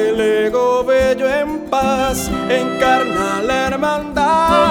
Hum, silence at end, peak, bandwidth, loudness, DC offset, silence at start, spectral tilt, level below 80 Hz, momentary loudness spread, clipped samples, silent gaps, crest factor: none; 0 s; 0 dBFS; 19.5 kHz; -16 LUFS; under 0.1%; 0 s; -4.5 dB/octave; -36 dBFS; 4 LU; under 0.1%; none; 14 dB